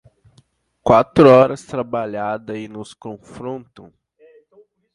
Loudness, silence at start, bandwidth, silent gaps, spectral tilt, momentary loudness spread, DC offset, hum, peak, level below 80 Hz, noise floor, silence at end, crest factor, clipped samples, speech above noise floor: -15 LUFS; 0.85 s; 11.5 kHz; none; -7.5 dB/octave; 23 LU; under 0.1%; none; 0 dBFS; -52 dBFS; -57 dBFS; 1.35 s; 18 dB; under 0.1%; 40 dB